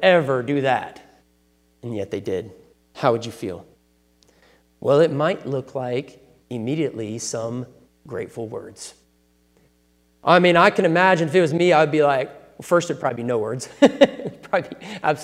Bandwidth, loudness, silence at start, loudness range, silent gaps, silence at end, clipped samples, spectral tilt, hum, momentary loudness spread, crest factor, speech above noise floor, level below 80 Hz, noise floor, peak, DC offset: 13.5 kHz; -20 LUFS; 0 s; 12 LU; none; 0 s; under 0.1%; -5.5 dB/octave; none; 18 LU; 22 dB; 41 dB; -62 dBFS; -61 dBFS; 0 dBFS; under 0.1%